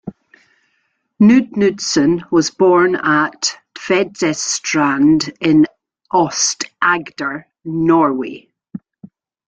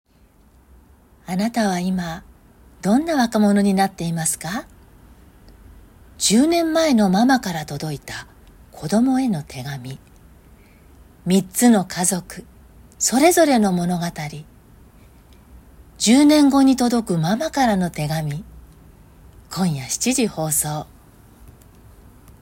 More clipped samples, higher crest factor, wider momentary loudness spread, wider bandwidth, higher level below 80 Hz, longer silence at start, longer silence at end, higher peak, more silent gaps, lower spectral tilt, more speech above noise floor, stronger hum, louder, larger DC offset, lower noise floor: neither; about the same, 14 dB vs 18 dB; second, 14 LU vs 17 LU; second, 9.2 kHz vs 16.5 kHz; second, -56 dBFS vs -48 dBFS; second, 0.05 s vs 1.3 s; second, 0.4 s vs 1.55 s; about the same, -2 dBFS vs -2 dBFS; neither; about the same, -4 dB/octave vs -4.5 dB/octave; first, 52 dB vs 35 dB; neither; first, -15 LUFS vs -19 LUFS; neither; first, -66 dBFS vs -53 dBFS